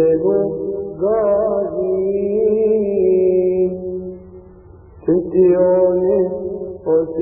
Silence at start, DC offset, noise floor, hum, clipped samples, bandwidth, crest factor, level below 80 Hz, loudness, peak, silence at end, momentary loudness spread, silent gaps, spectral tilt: 0 s; under 0.1%; -41 dBFS; none; under 0.1%; 2.8 kHz; 14 dB; -46 dBFS; -17 LUFS; -4 dBFS; 0 s; 12 LU; none; -16 dB/octave